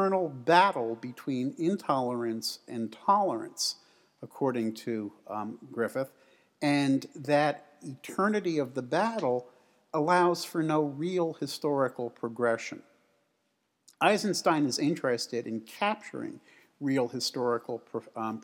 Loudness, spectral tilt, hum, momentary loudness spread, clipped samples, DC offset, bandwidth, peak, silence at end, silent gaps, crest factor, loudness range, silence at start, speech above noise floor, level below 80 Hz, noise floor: -30 LUFS; -4.5 dB/octave; none; 12 LU; under 0.1%; under 0.1%; 17.5 kHz; -8 dBFS; 0 s; none; 22 dB; 3 LU; 0 s; 47 dB; -90 dBFS; -77 dBFS